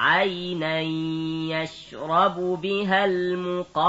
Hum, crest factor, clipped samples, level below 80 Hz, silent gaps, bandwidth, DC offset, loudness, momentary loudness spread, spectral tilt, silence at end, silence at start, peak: none; 16 dB; under 0.1%; -62 dBFS; none; 8 kHz; under 0.1%; -24 LUFS; 7 LU; -6 dB/octave; 0 s; 0 s; -8 dBFS